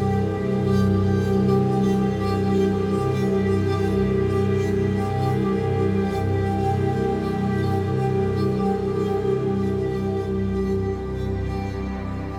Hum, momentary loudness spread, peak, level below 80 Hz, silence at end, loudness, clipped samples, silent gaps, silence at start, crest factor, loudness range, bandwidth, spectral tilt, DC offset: none; 5 LU; -8 dBFS; -38 dBFS; 0 s; -23 LUFS; under 0.1%; none; 0 s; 12 dB; 3 LU; 12.5 kHz; -8.5 dB/octave; under 0.1%